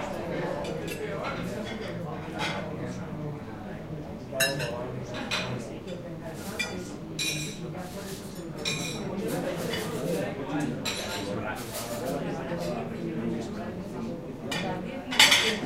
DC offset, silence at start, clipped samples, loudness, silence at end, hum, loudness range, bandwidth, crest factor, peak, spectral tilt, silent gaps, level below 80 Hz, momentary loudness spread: under 0.1%; 0 s; under 0.1%; -30 LUFS; 0 s; none; 3 LU; 16 kHz; 28 dB; -4 dBFS; -3.5 dB/octave; none; -52 dBFS; 10 LU